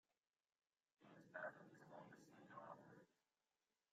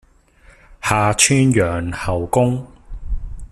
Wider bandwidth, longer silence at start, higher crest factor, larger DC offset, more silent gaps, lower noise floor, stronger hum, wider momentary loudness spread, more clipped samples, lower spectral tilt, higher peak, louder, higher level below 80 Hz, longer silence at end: second, 8.4 kHz vs 14 kHz; first, 1 s vs 0.7 s; first, 24 dB vs 18 dB; neither; neither; first, under -90 dBFS vs -49 dBFS; neither; second, 12 LU vs 19 LU; neither; about the same, -5.5 dB/octave vs -4.5 dB/octave; second, -40 dBFS vs 0 dBFS; second, -60 LUFS vs -17 LUFS; second, under -90 dBFS vs -32 dBFS; first, 0.8 s vs 0.05 s